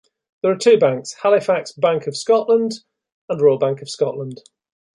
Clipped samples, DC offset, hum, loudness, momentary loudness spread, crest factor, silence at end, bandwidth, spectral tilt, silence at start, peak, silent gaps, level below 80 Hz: under 0.1%; under 0.1%; none; -18 LUFS; 12 LU; 16 dB; 0.65 s; 11.5 kHz; -5 dB/octave; 0.45 s; -2 dBFS; 3.12-3.28 s; -68 dBFS